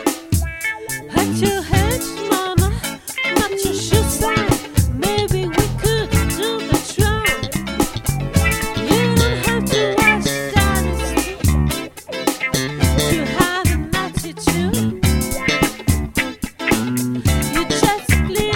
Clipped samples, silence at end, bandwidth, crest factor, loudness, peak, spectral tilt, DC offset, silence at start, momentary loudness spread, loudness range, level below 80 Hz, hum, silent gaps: under 0.1%; 0 s; 17.5 kHz; 18 dB; -18 LUFS; 0 dBFS; -4.5 dB/octave; under 0.1%; 0 s; 6 LU; 2 LU; -26 dBFS; none; none